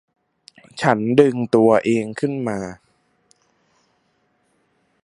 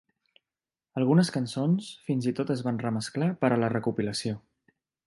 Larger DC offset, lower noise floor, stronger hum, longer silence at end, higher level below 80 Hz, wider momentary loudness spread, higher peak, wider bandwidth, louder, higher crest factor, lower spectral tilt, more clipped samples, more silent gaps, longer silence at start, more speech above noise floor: neither; second, -65 dBFS vs under -90 dBFS; neither; first, 2.3 s vs 0.7 s; first, -60 dBFS vs -66 dBFS; first, 14 LU vs 8 LU; first, 0 dBFS vs -8 dBFS; about the same, 11 kHz vs 11.5 kHz; first, -18 LUFS vs -28 LUFS; about the same, 22 dB vs 20 dB; about the same, -7 dB/octave vs -6.5 dB/octave; neither; neither; second, 0.75 s vs 0.95 s; second, 48 dB vs over 63 dB